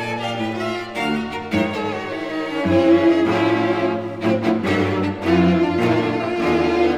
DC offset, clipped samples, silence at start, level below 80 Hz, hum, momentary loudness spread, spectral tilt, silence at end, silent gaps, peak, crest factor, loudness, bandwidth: 0.2%; under 0.1%; 0 s; -48 dBFS; none; 9 LU; -7 dB/octave; 0 s; none; -4 dBFS; 14 dB; -19 LUFS; 11 kHz